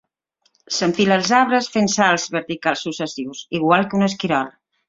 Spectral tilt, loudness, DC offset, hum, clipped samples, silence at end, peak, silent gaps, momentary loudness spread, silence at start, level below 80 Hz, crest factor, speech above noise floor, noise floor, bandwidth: -4 dB/octave; -19 LUFS; under 0.1%; none; under 0.1%; 0.4 s; 0 dBFS; none; 11 LU; 0.7 s; -60 dBFS; 20 dB; 48 dB; -66 dBFS; 7.8 kHz